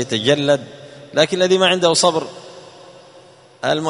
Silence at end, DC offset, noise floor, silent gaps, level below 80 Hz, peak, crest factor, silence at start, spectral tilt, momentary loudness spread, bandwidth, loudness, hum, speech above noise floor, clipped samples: 0 s; under 0.1%; -46 dBFS; none; -62 dBFS; 0 dBFS; 18 dB; 0 s; -3.5 dB/octave; 16 LU; 11 kHz; -16 LUFS; none; 29 dB; under 0.1%